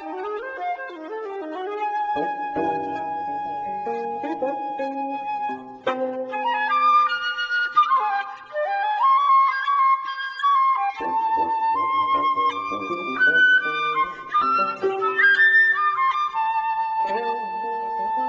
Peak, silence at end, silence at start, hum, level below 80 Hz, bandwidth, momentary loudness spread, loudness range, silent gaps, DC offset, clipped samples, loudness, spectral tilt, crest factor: -8 dBFS; 0 s; 0 s; none; -66 dBFS; 7.6 kHz; 12 LU; 9 LU; none; under 0.1%; under 0.1%; -21 LUFS; -4 dB/octave; 14 dB